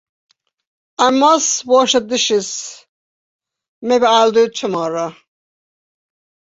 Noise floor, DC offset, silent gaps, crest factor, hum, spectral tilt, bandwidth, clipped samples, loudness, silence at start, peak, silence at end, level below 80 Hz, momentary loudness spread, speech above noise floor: under -90 dBFS; under 0.1%; 2.89-3.39 s, 3.68-3.82 s; 16 dB; none; -2 dB/octave; 8 kHz; under 0.1%; -14 LUFS; 1 s; -2 dBFS; 1.35 s; -62 dBFS; 15 LU; over 76 dB